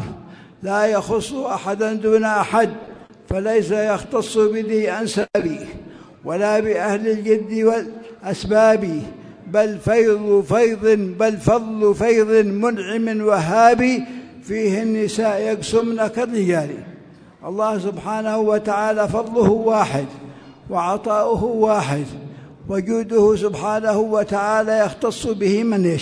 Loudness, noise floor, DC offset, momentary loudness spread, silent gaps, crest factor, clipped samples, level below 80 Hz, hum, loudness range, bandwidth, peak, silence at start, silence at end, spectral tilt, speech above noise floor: -19 LUFS; -43 dBFS; under 0.1%; 13 LU; none; 18 dB; under 0.1%; -48 dBFS; none; 4 LU; 11 kHz; 0 dBFS; 0 s; 0 s; -6 dB/octave; 25 dB